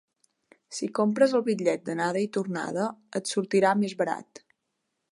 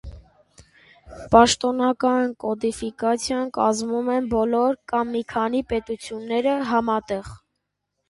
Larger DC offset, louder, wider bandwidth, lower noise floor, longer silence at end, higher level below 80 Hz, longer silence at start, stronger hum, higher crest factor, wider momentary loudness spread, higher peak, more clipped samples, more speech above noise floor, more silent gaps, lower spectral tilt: neither; second, -27 LUFS vs -22 LUFS; about the same, 11.5 kHz vs 11.5 kHz; about the same, -80 dBFS vs -78 dBFS; first, 0.9 s vs 0.75 s; second, -80 dBFS vs -48 dBFS; first, 0.7 s vs 0.05 s; neither; about the same, 18 dB vs 22 dB; about the same, 9 LU vs 9 LU; second, -10 dBFS vs 0 dBFS; neither; about the same, 54 dB vs 56 dB; neither; about the same, -5 dB/octave vs -4 dB/octave